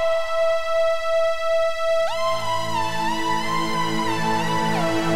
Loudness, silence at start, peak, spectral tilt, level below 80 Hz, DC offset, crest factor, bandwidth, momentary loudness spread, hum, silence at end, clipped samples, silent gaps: -22 LUFS; 0 s; -10 dBFS; -4.5 dB/octave; -46 dBFS; 4%; 12 dB; 16 kHz; 2 LU; none; 0 s; under 0.1%; none